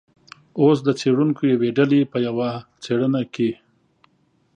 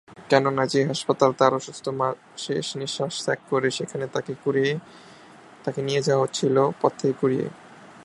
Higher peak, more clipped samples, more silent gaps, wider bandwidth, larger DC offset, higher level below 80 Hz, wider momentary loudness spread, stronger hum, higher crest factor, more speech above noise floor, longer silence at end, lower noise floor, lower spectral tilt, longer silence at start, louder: about the same, -4 dBFS vs -2 dBFS; neither; neither; second, 9.4 kHz vs 11.5 kHz; neither; about the same, -66 dBFS vs -68 dBFS; about the same, 9 LU vs 9 LU; neither; second, 16 dB vs 22 dB; first, 44 dB vs 24 dB; first, 1 s vs 0 s; first, -63 dBFS vs -48 dBFS; first, -7.5 dB/octave vs -5 dB/octave; first, 0.55 s vs 0.1 s; first, -20 LUFS vs -24 LUFS